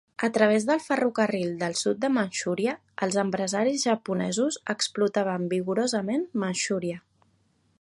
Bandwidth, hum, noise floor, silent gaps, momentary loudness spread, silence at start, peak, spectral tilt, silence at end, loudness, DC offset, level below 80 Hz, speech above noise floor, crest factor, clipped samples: 11.5 kHz; none; -67 dBFS; none; 5 LU; 0.2 s; -8 dBFS; -4 dB/octave; 0.8 s; -26 LUFS; under 0.1%; -72 dBFS; 41 dB; 20 dB; under 0.1%